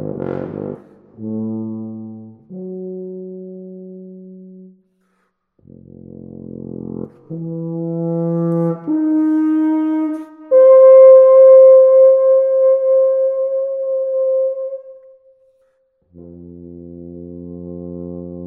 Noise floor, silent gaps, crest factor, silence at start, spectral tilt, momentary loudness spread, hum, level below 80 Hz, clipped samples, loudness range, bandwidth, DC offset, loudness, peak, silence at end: -66 dBFS; none; 14 dB; 0 s; -12 dB/octave; 27 LU; none; -60 dBFS; under 0.1%; 24 LU; 2.3 kHz; under 0.1%; -12 LUFS; 0 dBFS; 0 s